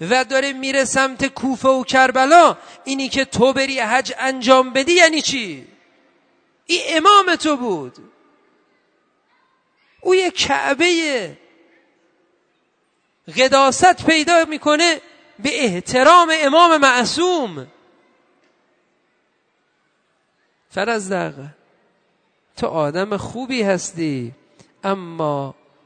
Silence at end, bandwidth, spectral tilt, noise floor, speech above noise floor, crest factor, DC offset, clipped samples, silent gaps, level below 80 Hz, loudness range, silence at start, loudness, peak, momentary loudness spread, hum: 0.35 s; 9.6 kHz; -3 dB/octave; -65 dBFS; 49 dB; 18 dB; under 0.1%; under 0.1%; none; -56 dBFS; 12 LU; 0 s; -16 LUFS; 0 dBFS; 15 LU; none